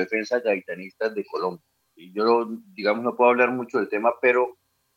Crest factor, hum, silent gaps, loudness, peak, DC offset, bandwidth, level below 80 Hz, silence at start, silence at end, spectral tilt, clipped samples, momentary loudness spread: 20 dB; none; none; -23 LUFS; -4 dBFS; under 0.1%; 7.2 kHz; -84 dBFS; 0 s; 0.45 s; -5.5 dB/octave; under 0.1%; 10 LU